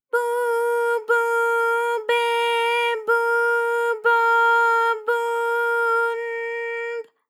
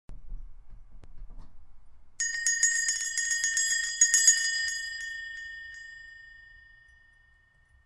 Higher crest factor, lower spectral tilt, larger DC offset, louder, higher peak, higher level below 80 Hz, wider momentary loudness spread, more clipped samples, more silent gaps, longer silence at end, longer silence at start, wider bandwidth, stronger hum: second, 12 dB vs 28 dB; first, 1 dB/octave vs 4 dB/octave; neither; first, -21 LUFS vs -25 LUFS; second, -8 dBFS vs -4 dBFS; second, under -90 dBFS vs -50 dBFS; second, 10 LU vs 23 LU; neither; neither; second, 0.25 s vs 1.3 s; about the same, 0.15 s vs 0.1 s; first, 15.5 kHz vs 11.5 kHz; neither